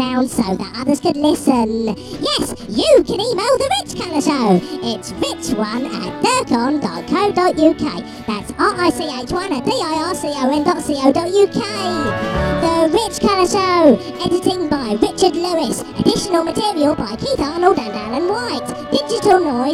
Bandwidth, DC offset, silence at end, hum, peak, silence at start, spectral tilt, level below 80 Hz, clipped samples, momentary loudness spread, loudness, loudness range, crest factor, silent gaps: 15 kHz; under 0.1%; 0 s; none; 0 dBFS; 0 s; -4.5 dB/octave; -40 dBFS; under 0.1%; 8 LU; -17 LUFS; 3 LU; 16 dB; none